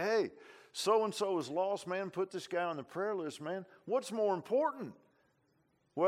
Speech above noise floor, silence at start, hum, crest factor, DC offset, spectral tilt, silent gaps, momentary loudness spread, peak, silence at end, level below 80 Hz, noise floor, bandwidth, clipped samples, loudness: 39 dB; 0 s; none; 18 dB; under 0.1%; -4.5 dB/octave; none; 11 LU; -18 dBFS; 0 s; -88 dBFS; -75 dBFS; 15.5 kHz; under 0.1%; -36 LUFS